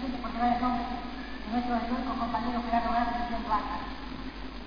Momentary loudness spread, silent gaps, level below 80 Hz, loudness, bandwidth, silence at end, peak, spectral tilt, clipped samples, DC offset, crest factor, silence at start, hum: 11 LU; none; -44 dBFS; -31 LUFS; 5.2 kHz; 0 s; -14 dBFS; -7 dB/octave; under 0.1%; 0.5%; 18 dB; 0 s; none